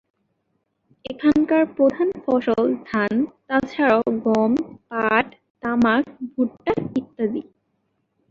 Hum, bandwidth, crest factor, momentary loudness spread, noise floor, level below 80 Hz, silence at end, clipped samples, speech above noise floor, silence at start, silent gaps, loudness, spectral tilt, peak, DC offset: none; 7.4 kHz; 20 dB; 10 LU; -72 dBFS; -56 dBFS; 0.9 s; under 0.1%; 52 dB; 1.1 s; 5.50-5.55 s; -21 LUFS; -7 dB/octave; -2 dBFS; under 0.1%